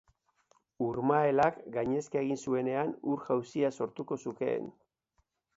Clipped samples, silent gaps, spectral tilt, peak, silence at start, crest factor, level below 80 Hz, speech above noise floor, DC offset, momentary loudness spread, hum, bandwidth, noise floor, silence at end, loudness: under 0.1%; none; -7 dB/octave; -12 dBFS; 0.8 s; 20 dB; -70 dBFS; 46 dB; under 0.1%; 10 LU; none; 8 kHz; -77 dBFS; 0.85 s; -32 LUFS